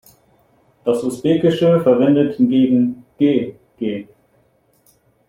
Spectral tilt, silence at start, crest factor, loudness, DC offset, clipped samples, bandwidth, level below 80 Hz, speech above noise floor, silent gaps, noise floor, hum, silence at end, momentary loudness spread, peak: -7.5 dB/octave; 0.85 s; 16 dB; -17 LUFS; under 0.1%; under 0.1%; 14.5 kHz; -58 dBFS; 43 dB; none; -59 dBFS; none; 1.25 s; 12 LU; -2 dBFS